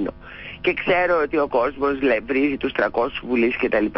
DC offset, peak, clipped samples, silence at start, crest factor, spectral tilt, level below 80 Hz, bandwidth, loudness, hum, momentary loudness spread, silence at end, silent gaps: under 0.1%; -8 dBFS; under 0.1%; 0 s; 12 dB; -10 dB/octave; -46 dBFS; 5.8 kHz; -21 LUFS; none; 5 LU; 0 s; none